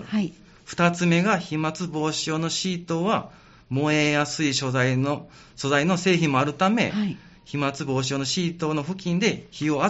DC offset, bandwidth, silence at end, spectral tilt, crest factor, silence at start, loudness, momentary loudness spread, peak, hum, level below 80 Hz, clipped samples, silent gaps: under 0.1%; 8 kHz; 0 s; -4.5 dB/octave; 18 dB; 0 s; -24 LUFS; 7 LU; -6 dBFS; none; -58 dBFS; under 0.1%; none